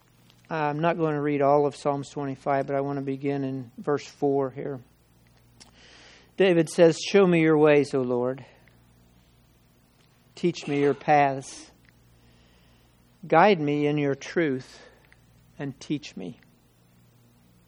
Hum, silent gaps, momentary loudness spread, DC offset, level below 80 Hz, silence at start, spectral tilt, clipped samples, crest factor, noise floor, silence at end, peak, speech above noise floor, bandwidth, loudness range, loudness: none; none; 17 LU; under 0.1%; -66 dBFS; 0.5 s; -6 dB/octave; under 0.1%; 22 dB; -60 dBFS; 1.35 s; -4 dBFS; 36 dB; 12 kHz; 8 LU; -24 LUFS